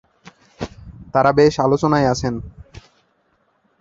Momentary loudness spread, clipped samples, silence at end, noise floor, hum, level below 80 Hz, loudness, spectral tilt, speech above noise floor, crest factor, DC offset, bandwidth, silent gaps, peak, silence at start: 19 LU; under 0.1%; 1 s; -63 dBFS; none; -44 dBFS; -17 LUFS; -6.5 dB/octave; 48 dB; 18 dB; under 0.1%; 7.8 kHz; none; -2 dBFS; 0.6 s